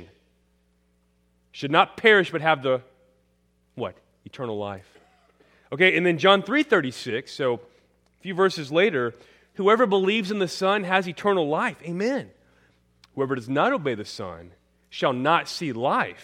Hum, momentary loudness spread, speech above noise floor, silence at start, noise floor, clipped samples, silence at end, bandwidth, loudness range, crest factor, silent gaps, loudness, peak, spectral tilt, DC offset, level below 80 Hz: none; 16 LU; 43 dB; 0 s; -66 dBFS; under 0.1%; 0.1 s; 13 kHz; 6 LU; 22 dB; none; -23 LUFS; -2 dBFS; -5 dB/octave; under 0.1%; -68 dBFS